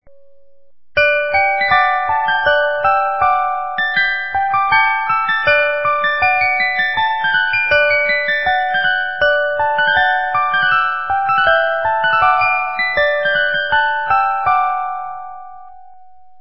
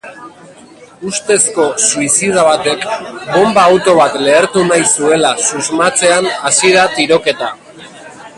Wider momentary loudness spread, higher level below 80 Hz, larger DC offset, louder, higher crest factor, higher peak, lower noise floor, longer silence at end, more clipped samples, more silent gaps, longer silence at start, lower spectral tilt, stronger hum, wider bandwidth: second, 4 LU vs 11 LU; first, -46 dBFS vs -52 dBFS; first, 1% vs under 0.1%; second, -14 LUFS vs -11 LUFS; about the same, 14 dB vs 12 dB; about the same, 0 dBFS vs 0 dBFS; first, -59 dBFS vs -38 dBFS; first, 0.7 s vs 0.1 s; neither; neither; about the same, 0 s vs 0.05 s; first, -7 dB/octave vs -2.5 dB/octave; neither; second, 5.8 kHz vs 11.5 kHz